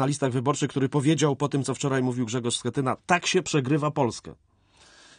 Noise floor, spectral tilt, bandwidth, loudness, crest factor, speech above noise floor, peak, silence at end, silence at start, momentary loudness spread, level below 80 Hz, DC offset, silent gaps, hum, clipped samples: -57 dBFS; -5 dB/octave; 10 kHz; -25 LUFS; 20 dB; 32 dB; -6 dBFS; 0.85 s; 0 s; 5 LU; -62 dBFS; under 0.1%; none; none; under 0.1%